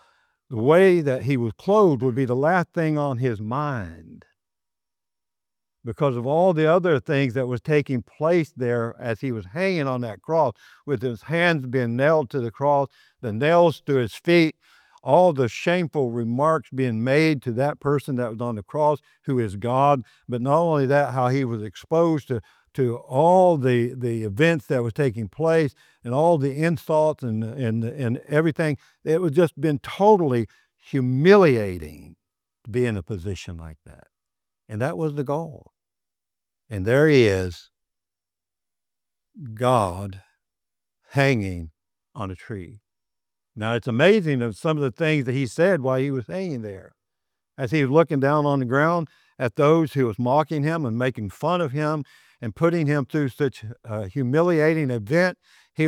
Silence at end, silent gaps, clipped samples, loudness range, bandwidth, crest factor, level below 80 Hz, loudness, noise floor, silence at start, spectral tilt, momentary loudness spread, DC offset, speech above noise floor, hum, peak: 0 s; none; under 0.1%; 7 LU; 15 kHz; 20 dB; -60 dBFS; -22 LUFS; -89 dBFS; 0.5 s; -7.5 dB/octave; 14 LU; under 0.1%; 68 dB; none; -2 dBFS